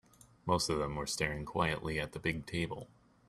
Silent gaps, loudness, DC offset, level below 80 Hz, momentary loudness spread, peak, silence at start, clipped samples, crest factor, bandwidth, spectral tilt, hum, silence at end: none; -36 LUFS; under 0.1%; -54 dBFS; 9 LU; -16 dBFS; 0.45 s; under 0.1%; 22 dB; 14.5 kHz; -4 dB/octave; none; 0.4 s